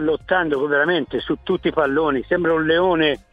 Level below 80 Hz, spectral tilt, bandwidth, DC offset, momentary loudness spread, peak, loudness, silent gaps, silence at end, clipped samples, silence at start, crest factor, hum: -46 dBFS; -7.5 dB/octave; 5 kHz; under 0.1%; 5 LU; -4 dBFS; -19 LUFS; none; 0.15 s; under 0.1%; 0 s; 16 dB; none